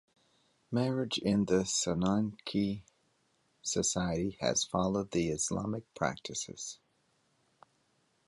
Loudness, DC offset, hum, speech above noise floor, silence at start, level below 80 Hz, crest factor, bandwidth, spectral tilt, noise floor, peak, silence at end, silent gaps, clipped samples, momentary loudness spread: -33 LUFS; under 0.1%; none; 41 dB; 0.7 s; -58 dBFS; 20 dB; 11.5 kHz; -4.5 dB/octave; -74 dBFS; -14 dBFS; 1.55 s; none; under 0.1%; 10 LU